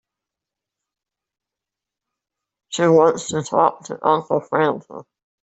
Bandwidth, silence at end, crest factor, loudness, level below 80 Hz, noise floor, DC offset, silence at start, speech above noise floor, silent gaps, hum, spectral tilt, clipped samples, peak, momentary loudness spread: 8.2 kHz; 0.45 s; 20 dB; -19 LUFS; -66 dBFS; -86 dBFS; under 0.1%; 2.7 s; 68 dB; none; none; -5 dB/octave; under 0.1%; -2 dBFS; 13 LU